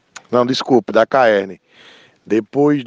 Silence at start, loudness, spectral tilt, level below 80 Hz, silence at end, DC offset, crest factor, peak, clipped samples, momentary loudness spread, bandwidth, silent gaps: 0.3 s; -16 LUFS; -6 dB/octave; -64 dBFS; 0 s; under 0.1%; 16 dB; 0 dBFS; under 0.1%; 8 LU; 8 kHz; none